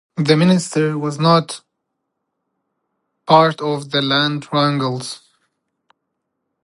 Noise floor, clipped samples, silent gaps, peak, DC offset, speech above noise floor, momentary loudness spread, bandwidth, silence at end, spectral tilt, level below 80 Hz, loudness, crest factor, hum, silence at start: -76 dBFS; under 0.1%; none; 0 dBFS; under 0.1%; 60 dB; 17 LU; 11.5 kHz; 1.5 s; -5.5 dB/octave; -64 dBFS; -16 LUFS; 18 dB; none; 0.15 s